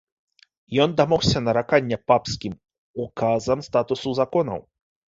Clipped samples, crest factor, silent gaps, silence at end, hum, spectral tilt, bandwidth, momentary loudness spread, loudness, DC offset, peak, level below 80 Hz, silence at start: under 0.1%; 20 dB; 2.78-2.94 s; 0.5 s; none; -5.5 dB/octave; 7.8 kHz; 14 LU; -22 LUFS; under 0.1%; -4 dBFS; -48 dBFS; 0.7 s